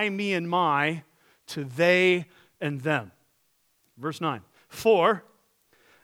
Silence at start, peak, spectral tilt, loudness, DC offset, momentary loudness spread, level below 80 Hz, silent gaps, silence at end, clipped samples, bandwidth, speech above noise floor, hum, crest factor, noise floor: 0 s; -8 dBFS; -5.5 dB/octave; -25 LUFS; under 0.1%; 17 LU; -74 dBFS; none; 0.85 s; under 0.1%; 17 kHz; 44 dB; none; 20 dB; -69 dBFS